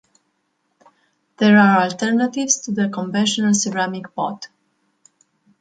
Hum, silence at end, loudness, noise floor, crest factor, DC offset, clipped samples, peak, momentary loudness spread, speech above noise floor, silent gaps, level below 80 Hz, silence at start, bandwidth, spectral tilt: none; 1.15 s; -18 LUFS; -69 dBFS; 18 dB; under 0.1%; under 0.1%; -2 dBFS; 13 LU; 52 dB; none; -66 dBFS; 1.4 s; 9.2 kHz; -4 dB/octave